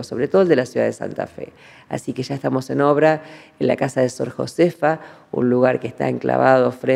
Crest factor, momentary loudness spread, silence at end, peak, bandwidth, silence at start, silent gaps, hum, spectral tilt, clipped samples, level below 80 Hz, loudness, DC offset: 20 dB; 13 LU; 0 s; 0 dBFS; 13.5 kHz; 0 s; none; none; -6.5 dB/octave; under 0.1%; -64 dBFS; -19 LUFS; under 0.1%